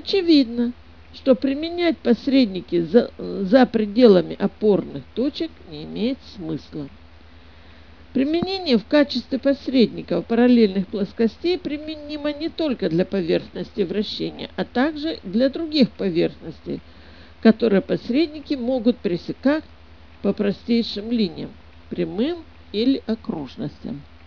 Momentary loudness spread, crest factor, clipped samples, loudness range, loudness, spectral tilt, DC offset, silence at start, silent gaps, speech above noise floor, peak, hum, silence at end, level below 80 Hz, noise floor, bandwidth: 14 LU; 22 dB; under 0.1%; 7 LU; -21 LUFS; -7.5 dB/octave; 0.4%; 0.05 s; none; 26 dB; 0 dBFS; none; 0.25 s; -50 dBFS; -47 dBFS; 5.4 kHz